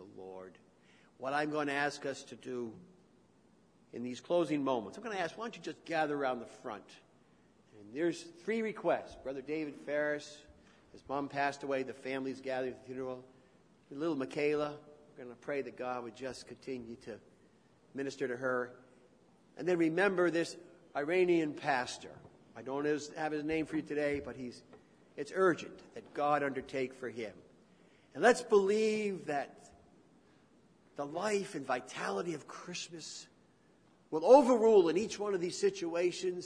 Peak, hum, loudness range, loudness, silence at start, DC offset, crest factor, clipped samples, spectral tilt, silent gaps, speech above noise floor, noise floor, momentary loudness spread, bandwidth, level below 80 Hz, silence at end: -12 dBFS; none; 9 LU; -35 LUFS; 0 s; under 0.1%; 24 dB; under 0.1%; -5 dB/octave; none; 33 dB; -67 dBFS; 18 LU; 10.5 kHz; -72 dBFS; 0 s